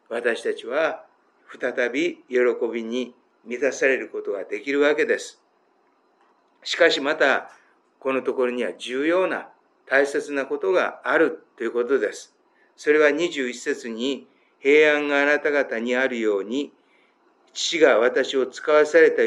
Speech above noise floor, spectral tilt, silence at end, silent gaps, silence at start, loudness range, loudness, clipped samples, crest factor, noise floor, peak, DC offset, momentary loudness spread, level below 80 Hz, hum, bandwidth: 42 dB; -3 dB/octave; 0 s; none; 0.1 s; 4 LU; -22 LUFS; under 0.1%; 20 dB; -63 dBFS; -4 dBFS; under 0.1%; 12 LU; under -90 dBFS; none; 11 kHz